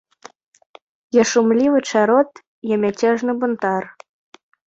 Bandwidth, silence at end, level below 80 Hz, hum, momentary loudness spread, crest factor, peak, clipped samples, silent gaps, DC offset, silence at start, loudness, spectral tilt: 8 kHz; 0.75 s; -64 dBFS; none; 9 LU; 16 dB; -2 dBFS; under 0.1%; 2.47-2.62 s; under 0.1%; 1.15 s; -18 LUFS; -4.5 dB/octave